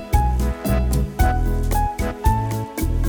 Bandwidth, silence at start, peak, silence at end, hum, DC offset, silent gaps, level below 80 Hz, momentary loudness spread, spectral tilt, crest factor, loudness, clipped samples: over 20 kHz; 0 s; -4 dBFS; 0 s; none; under 0.1%; none; -22 dBFS; 4 LU; -6.5 dB/octave; 16 dB; -22 LUFS; under 0.1%